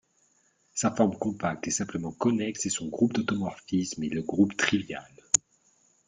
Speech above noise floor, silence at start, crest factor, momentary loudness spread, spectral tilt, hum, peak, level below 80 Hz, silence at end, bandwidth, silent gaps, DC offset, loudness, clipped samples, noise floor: 40 dB; 0.75 s; 28 dB; 6 LU; -4 dB/octave; none; 0 dBFS; -64 dBFS; 0.7 s; 9.6 kHz; none; under 0.1%; -28 LUFS; under 0.1%; -68 dBFS